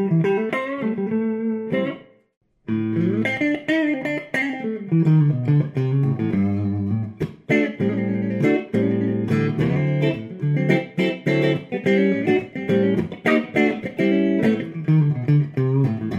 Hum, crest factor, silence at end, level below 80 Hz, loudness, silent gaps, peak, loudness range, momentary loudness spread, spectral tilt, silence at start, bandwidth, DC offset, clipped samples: none; 16 dB; 0 s; -60 dBFS; -21 LUFS; 2.37-2.41 s; -4 dBFS; 3 LU; 6 LU; -8.5 dB/octave; 0 s; 7.8 kHz; under 0.1%; under 0.1%